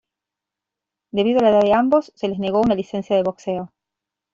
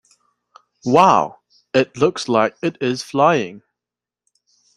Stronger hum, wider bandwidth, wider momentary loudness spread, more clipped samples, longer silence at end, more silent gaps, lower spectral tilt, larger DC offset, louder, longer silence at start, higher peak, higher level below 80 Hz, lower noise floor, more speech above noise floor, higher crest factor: second, none vs 60 Hz at -45 dBFS; second, 7.4 kHz vs 12.5 kHz; about the same, 12 LU vs 11 LU; neither; second, 0.65 s vs 1.2 s; neither; first, -7 dB/octave vs -5.5 dB/octave; neither; about the same, -19 LUFS vs -17 LUFS; first, 1.15 s vs 0.85 s; second, -4 dBFS vs 0 dBFS; about the same, -56 dBFS vs -60 dBFS; about the same, -86 dBFS vs -88 dBFS; second, 67 dB vs 71 dB; about the same, 16 dB vs 18 dB